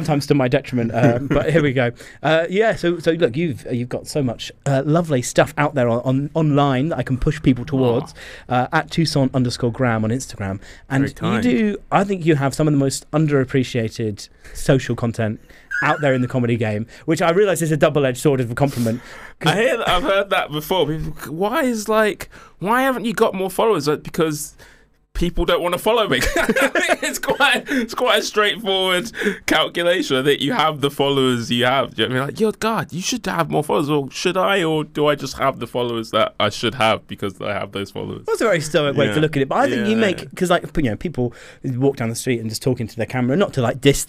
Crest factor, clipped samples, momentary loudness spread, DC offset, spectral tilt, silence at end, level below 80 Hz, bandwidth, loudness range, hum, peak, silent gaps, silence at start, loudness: 18 dB; under 0.1%; 8 LU; under 0.1%; -5 dB/octave; 0 s; -40 dBFS; 16 kHz; 3 LU; none; -2 dBFS; none; 0 s; -19 LUFS